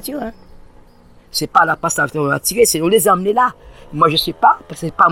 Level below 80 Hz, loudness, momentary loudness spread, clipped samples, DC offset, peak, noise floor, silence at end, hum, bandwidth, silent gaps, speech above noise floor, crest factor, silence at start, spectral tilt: -44 dBFS; -15 LUFS; 13 LU; under 0.1%; under 0.1%; 0 dBFS; -45 dBFS; 0 s; none; 17 kHz; none; 30 dB; 16 dB; 0 s; -3.5 dB/octave